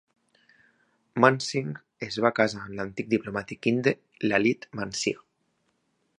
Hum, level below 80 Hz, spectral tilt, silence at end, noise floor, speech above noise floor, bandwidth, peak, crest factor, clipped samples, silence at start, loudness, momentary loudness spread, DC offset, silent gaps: none; -64 dBFS; -5 dB/octave; 1 s; -73 dBFS; 47 dB; 11 kHz; -2 dBFS; 26 dB; under 0.1%; 1.15 s; -27 LUFS; 13 LU; under 0.1%; none